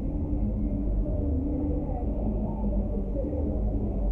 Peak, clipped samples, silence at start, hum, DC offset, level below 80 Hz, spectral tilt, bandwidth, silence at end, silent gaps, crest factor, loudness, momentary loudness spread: -16 dBFS; under 0.1%; 0 s; none; under 0.1%; -30 dBFS; -13 dB/octave; 2.6 kHz; 0 s; none; 12 dB; -30 LUFS; 2 LU